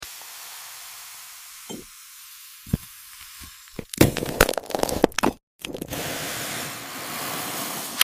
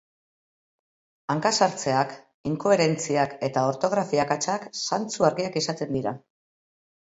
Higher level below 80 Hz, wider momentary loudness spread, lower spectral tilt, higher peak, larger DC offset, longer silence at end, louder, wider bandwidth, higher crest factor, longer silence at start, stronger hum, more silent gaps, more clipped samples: first, -42 dBFS vs -64 dBFS; first, 19 LU vs 9 LU; about the same, -3.5 dB/octave vs -4 dB/octave; first, 0 dBFS vs -6 dBFS; neither; second, 0 s vs 1 s; about the same, -26 LUFS vs -25 LUFS; first, 16 kHz vs 8.2 kHz; first, 28 dB vs 20 dB; second, 0 s vs 1.3 s; neither; first, 5.43-5.59 s vs 2.34-2.44 s; neither